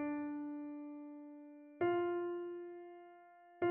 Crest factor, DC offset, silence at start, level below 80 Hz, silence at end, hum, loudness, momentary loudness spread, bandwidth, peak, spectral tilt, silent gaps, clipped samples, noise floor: 16 dB; under 0.1%; 0 s; -86 dBFS; 0 s; none; -42 LUFS; 20 LU; 3.3 kHz; -26 dBFS; -5.5 dB/octave; none; under 0.1%; -61 dBFS